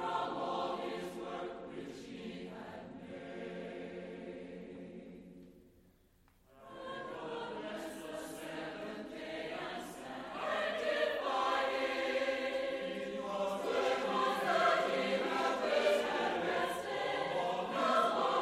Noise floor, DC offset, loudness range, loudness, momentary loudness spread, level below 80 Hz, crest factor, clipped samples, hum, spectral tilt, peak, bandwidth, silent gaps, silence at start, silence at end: -68 dBFS; under 0.1%; 15 LU; -36 LUFS; 16 LU; -70 dBFS; 18 dB; under 0.1%; none; -4 dB/octave; -20 dBFS; 15.5 kHz; none; 0 s; 0 s